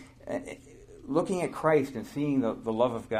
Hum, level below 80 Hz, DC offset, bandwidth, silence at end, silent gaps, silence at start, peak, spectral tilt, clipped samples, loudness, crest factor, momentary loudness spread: none; -58 dBFS; under 0.1%; 14.5 kHz; 0 s; none; 0 s; -10 dBFS; -6.5 dB/octave; under 0.1%; -29 LUFS; 20 dB; 14 LU